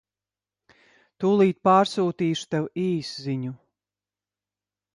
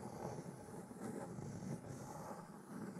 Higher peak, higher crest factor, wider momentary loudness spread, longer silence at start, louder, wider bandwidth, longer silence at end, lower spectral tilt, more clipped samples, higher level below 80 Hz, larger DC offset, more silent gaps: first, -6 dBFS vs -30 dBFS; about the same, 20 dB vs 20 dB; first, 11 LU vs 5 LU; first, 1.2 s vs 0 s; first, -24 LUFS vs -50 LUFS; second, 11.5 kHz vs 15.5 kHz; first, 1.4 s vs 0 s; about the same, -6.5 dB/octave vs -6.5 dB/octave; neither; about the same, -70 dBFS vs -74 dBFS; neither; neither